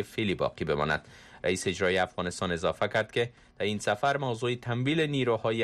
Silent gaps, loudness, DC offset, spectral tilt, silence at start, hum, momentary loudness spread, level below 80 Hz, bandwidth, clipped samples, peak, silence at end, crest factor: none; -29 LUFS; under 0.1%; -5 dB/octave; 0 s; none; 5 LU; -58 dBFS; 13.5 kHz; under 0.1%; -16 dBFS; 0 s; 14 dB